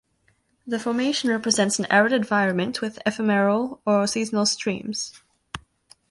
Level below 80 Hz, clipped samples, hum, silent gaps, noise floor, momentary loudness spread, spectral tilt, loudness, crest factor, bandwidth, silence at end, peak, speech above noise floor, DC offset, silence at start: -62 dBFS; under 0.1%; none; none; -66 dBFS; 12 LU; -3.5 dB/octave; -22 LUFS; 20 dB; 11.5 kHz; 0.5 s; -4 dBFS; 44 dB; under 0.1%; 0.65 s